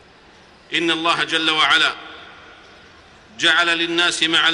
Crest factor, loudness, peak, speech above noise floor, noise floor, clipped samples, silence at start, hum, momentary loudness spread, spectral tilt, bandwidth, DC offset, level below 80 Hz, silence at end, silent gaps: 16 dB; -16 LUFS; -4 dBFS; 30 dB; -48 dBFS; under 0.1%; 0.7 s; none; 8 LU; -1.5 dB/octave; 11 kHz; under 0.1%; -60 dBFS; 0 s; none